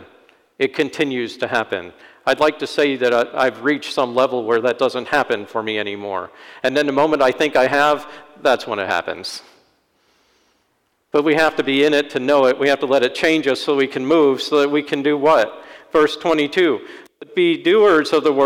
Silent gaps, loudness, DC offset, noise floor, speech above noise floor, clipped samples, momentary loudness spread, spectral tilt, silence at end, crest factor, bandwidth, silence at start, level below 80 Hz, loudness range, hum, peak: none; -18 LUFS; under 0.1%; -66 dBFS; 49 dB; under 0.1%; 9 LU; -4.5 dB/octave; 0 s; 12 dB; 16 kHz; 0 s; -60 dBFS; 4 LU; none; -6 dBFS